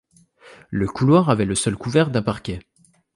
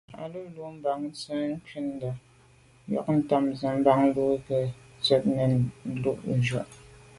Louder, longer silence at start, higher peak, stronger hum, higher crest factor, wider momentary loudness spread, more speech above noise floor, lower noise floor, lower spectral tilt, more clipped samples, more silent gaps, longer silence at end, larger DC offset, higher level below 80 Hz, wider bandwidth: first, -20 LUFS vs -27 LUFS; first, 0.45 s vs 0.1 s; first, -4 dBFS vs -8 dBFS; neither; about the same, 18 dB vs 20 dB; about the same, 13 LU vs 15 LU; about the same, 31 dB vs 31 dB; second, -50 dBFS vs -57 dBFS; about the same, -6 dB/octave vs -7 dB/octave; neither; neither; first, 0.55 s vs 0.25 s; neither; first, -46 dBFS vs -58 dBFS; about the same, 11.5 kHz vs 11.5 kHz